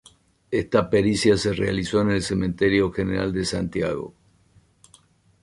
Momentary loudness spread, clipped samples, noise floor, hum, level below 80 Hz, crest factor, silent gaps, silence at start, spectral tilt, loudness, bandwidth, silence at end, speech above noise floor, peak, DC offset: 8 LU; under 0.1%; -58 dBFS; none; -44 dBFS; 18 dB; none; 0.5 s; -5.5 dB/octave; -23 LUFS; 11.5 kHz; 1.3 s; 37 dB; -6 dBFS; under 0.1%